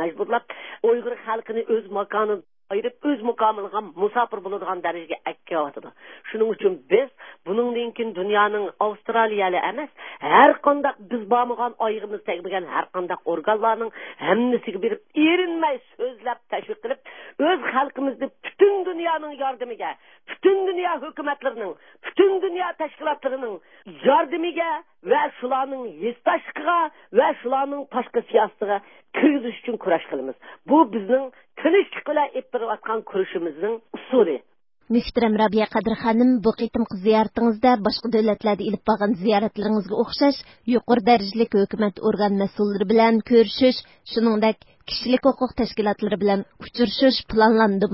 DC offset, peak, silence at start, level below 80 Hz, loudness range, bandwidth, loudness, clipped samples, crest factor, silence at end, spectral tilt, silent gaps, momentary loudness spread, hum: 0.1%; 0 dBFS; 0 s; -56 dBFS; 5 LU; 5.8 kHz; -22 LUFS; under 0.1%; 22 dB; 0 s; -9.5 dB/octave; none; 12 LU; none